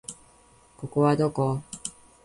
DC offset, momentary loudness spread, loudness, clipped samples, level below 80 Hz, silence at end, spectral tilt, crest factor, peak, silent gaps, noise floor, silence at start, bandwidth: under 0.1%; 18 LU; -26 LUFS; under 0.1%; -60 dBFS; 0.35 s; -6.5 dB/octave; 18 dB; -10 dBFS; none; -57 dBFS; 0.1 s; 11.5 kHz